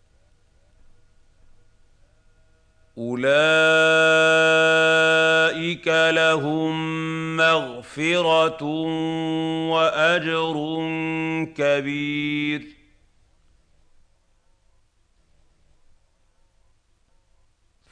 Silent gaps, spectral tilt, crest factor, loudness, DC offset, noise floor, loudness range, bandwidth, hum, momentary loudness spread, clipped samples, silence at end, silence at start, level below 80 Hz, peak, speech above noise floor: none; -4.5 dB/octave; 16 dB; -20 LUFS; under 0.1%; -62 dBFS; 11 LU; 9.8 kHz; none; 10 LU; under 0.1%; 5.2 s; 2.95 s; -60 dBFS; -8 dBFS; 40 dB